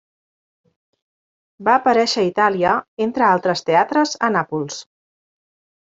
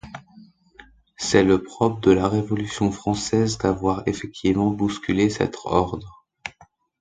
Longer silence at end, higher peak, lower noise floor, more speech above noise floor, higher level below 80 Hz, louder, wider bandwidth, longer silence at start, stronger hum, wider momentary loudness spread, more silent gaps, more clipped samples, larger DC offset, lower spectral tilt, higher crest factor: first, 1 s vs 0.5 s; about the same, -2 dBFS vs 0 dBFS; first, under -90 dBFS vs -55 dBFS; first, over 73 dB vs 34 dB; second, -62 dBFS vs -44 dBFS; first, -18 LUFS vs -22 LUFS; second, 8 kHz vs 9.4 kHz; first, 1.6 s vs 0.05 s; neither; second, 9 LU vs 18 LU; first, 2.88-2.97 s vs none; neither; neither; about the same, -4.5 dB/octave vs -5.5 dB/octave; about the same, 18 dB vs 22 dB